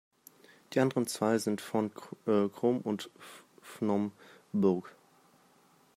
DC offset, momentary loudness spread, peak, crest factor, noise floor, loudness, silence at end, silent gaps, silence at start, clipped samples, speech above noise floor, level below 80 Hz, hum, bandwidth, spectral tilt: under 0.1%; 15 LU; -14 dBFS; 20 dB; -65 dBFS; -32 LUFS; 1.05 s; none; 0.7 s; under 0.1%; 34 dB; -78 dBFS; none; 16 kHz; -6 dB/octave